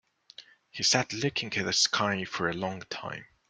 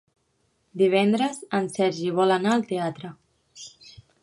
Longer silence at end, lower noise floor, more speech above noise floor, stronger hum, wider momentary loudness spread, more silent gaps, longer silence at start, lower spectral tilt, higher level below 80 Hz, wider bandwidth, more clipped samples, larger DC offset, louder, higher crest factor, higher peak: second, 0.25 s vs 0.55 s; second, -53 dBFS vs -70 dBFS; second, 24 dB vs 47 dB; neither; second, 13 LU vs 22 LU; neither; second, 0.4 s vs 0.75 s; second, -2.5 dB/octave vs -5.5 dB/octave; about the same, -66 dBFS vs -70 dBFS; about the same, 12 kHz vs 11.5 kHz; neither; neither; second, -28 LUFS vs -23 LUFS; first, 24 dB vs 18 dB; about the same, -8 dBFS vs -8 dBFS